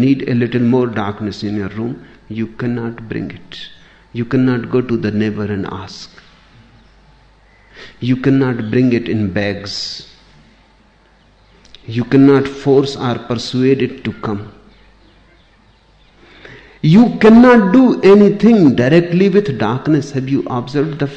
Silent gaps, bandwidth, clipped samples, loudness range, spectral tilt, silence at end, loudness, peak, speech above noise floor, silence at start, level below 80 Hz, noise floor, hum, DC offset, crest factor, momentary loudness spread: none; 8.2 kHz; under 0.1%; 13 LU; -7.5 dB/octave; 0 s; -14 LUFS; 0 dBFS; 37 dB; 0 s; -46 dBFS; -50 dBFS; none; under 0.1%; 14 dB; 17 LU